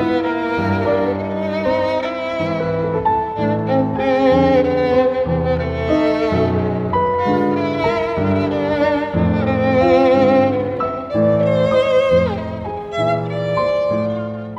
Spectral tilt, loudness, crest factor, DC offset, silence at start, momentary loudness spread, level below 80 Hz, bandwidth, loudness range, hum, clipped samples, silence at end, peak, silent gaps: -8 dB/octave; -17 LUFS; 14 dB; under 0.1%; 0 s; 7 LU; -40 dBFS; 7.8 kHz; 4 LU; none; under 0.1%; 0 s; -2 dBFS; none